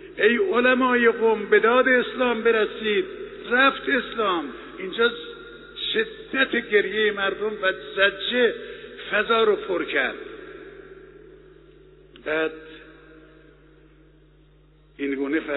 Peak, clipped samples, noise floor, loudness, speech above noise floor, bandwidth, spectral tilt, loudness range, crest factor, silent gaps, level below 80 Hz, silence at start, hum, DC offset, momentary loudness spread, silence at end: -4 dBFS; under 0.1%; -55 dBFS; -22 LUFS; 33 dB; 4.1 kHz; -0.5 dB/octave; 14 LU; 20 dB; none; -56 dBFS; 0 s; none; under 0.1%; 18 LU; 0 s